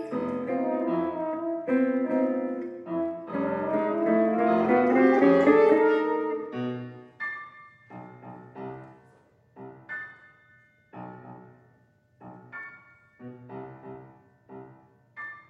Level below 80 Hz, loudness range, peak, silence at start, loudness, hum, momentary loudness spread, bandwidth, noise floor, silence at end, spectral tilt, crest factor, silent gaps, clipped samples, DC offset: -72 dBFS; 23 LU; -8 dBFS; 0 s; -25 LUFS; none; 26 LU; 6.4 kHz; -63 dBFS; 0.1 s; -8.5 dB/octave; 20 dB; none; under 0.1%; under 0.1%